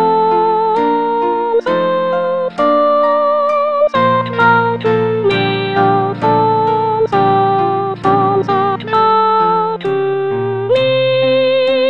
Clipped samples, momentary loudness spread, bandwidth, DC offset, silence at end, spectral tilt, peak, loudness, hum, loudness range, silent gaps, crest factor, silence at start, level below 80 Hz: under 0.1%; 4 LU; 7.2 kHz; 0.5%; 0 s; -7.5 dB/octave; 0 dBFS; -13 LUFS; none; 1 LU; none; 12 dB; 0 s; -54 dBFS